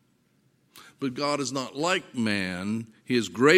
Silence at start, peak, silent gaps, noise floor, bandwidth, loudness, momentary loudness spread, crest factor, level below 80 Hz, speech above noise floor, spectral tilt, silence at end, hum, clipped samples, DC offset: 0.75 s; -4 dBFS; none; -67 dBFS; 16 kHz; -28 LUFS; 7 LU; 22 dB; -72 dBFS; 41 dB; -4.5 dB/octave; 0 s; none; under 0.1%; under 0.1%